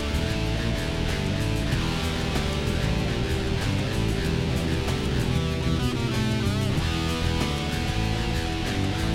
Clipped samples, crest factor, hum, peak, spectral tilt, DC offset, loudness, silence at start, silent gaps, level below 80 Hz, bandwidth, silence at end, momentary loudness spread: under 0.1%; 14 dB; none; -12 dBFS; -5.5 dB/octave; under 0.1%; -26 LUFS; 0 s; none; -32 dBFS; 16 kHz; 0 s; 2 LU